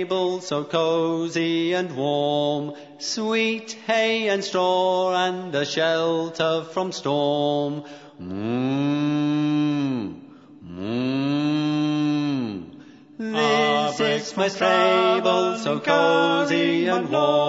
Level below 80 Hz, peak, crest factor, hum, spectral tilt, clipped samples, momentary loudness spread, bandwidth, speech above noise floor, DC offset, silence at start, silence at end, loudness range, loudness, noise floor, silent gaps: -70 dBFS; -4 dBFS; 18 dB; none; -5 dB/octave; under 0.1%; 10 LU; 8 kHz; 23 dB; under 0.1%; 0 s; 0 s; 5 LU; -22 LUFS; -45 dBFS; none